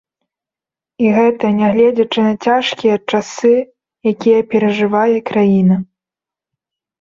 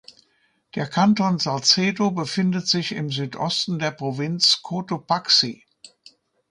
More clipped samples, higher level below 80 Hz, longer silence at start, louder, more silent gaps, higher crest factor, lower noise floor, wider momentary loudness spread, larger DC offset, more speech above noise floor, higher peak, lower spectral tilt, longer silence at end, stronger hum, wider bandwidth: neither; first, -58 dBFS vs -66 dBFS; first, 1 s vs 0.75 s; first, -14 LUFS vs -21 LUFS; neither; second, 12 dB vs 20 dB; first, -88 dBFS vs -66 dBFS; second, 7 LU vs 10 LU; neither; first, 75 dB vs 44 dB; about the same, -2 dBFS vs -2 dBFS; first, -6.5 dB/octave vs -4 dB/octave; first, 1.15 s vs 0.65 s; neither; second, 7.6 kHz vs 11.5 kHz